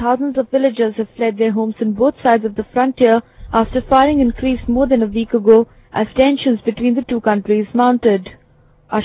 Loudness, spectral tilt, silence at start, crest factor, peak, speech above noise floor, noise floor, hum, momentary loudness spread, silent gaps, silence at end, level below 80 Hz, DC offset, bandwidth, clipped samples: -16 LUFS; -10.5 dB/octave; 0 s; 16 dB; 0 dBFS; 36 dB; -50 dBFS; none; 7 LU; none; 0 s; -38 dBFS; under 0.1%; 4 kHz; under 0.1%